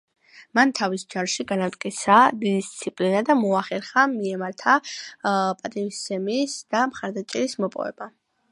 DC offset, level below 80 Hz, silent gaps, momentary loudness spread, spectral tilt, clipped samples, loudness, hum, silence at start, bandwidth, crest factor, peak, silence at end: under 0.1%; -72 dBFS; none; 10 LU; -4 dB/octave; under 0.1%; -23 LUFS; none; 0.35 s; 11.5 kHz; 22 dB; -2 dBFS; 0.45 s